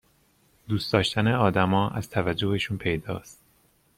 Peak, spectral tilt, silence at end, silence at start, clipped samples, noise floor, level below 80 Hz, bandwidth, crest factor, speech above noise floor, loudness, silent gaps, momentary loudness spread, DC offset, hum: -4 dBFS; -6 dB/octave; 0.65 s; 0.7 s; under 0.1%; -64 dBFS; -52 dBFS; 15.5 kHz; 22 dB; 39 dB; -25 LUFS; none; 9 LU; under 0.1%; none